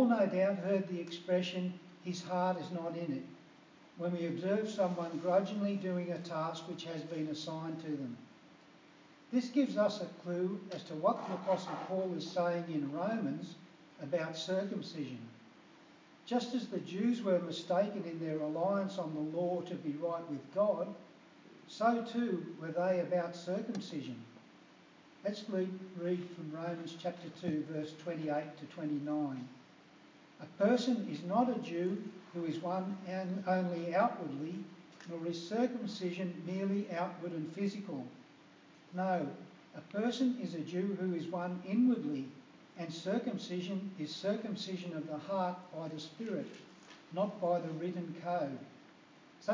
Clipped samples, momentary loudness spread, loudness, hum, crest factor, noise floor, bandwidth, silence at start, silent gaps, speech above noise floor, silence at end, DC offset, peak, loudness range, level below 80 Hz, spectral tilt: under 0.1%; 12 LU; -37 LUFS; none; 20 dB; -61 dBFS; 7.6 kHz; 0 s; none; 24 dB; 0 s; under 0.1%; -18 dBFS; 5 LU; under -90 dBFS; -6.5 dB/octave